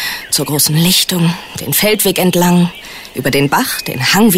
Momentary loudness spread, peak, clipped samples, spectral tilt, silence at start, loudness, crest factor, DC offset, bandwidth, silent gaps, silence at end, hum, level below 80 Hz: 8 LU; 0 dBFS; under 0.1%; -4 dB/octave; 0 s; -12 LUFS; 12 dB; under 0.1%; 16.5 kHz; none; 0 s; none; -44 dBFS